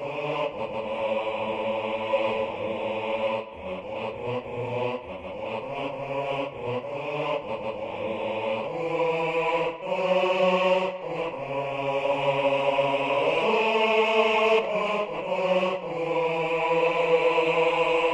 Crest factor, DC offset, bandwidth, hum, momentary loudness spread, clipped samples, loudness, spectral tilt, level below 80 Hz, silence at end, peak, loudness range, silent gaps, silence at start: 18 dB; under 0.1%; 9.8 kHz; none; 10 LU; under 0.1%; -26 LUFS; -5.5 dB/octave; -60 dBFS; 0 s; -8 dBFS; 8 LU; none; 0 s